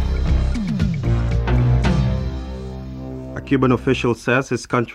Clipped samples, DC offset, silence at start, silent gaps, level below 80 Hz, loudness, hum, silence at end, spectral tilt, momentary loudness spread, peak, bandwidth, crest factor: under 0.1%; under 0.1%; 0 s; none; -24 dBFS; -20 LUFS; none; 0 s; -7 dB/octave; 14 LU; -4 dBFS; 10.5 kHz; 16 dB